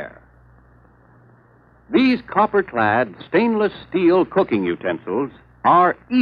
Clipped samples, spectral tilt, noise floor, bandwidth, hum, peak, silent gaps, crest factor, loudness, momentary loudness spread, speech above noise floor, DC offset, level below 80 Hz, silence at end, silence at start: under 0.1%; -8.5 dB/octave; -52 dBFS; 5.2 kHz; none; -4 dBFS; none; 16 dB; -19 LUFS; 9 LU; 34 dB; under 0.1%; -56 dBFS; 0 s; 0 s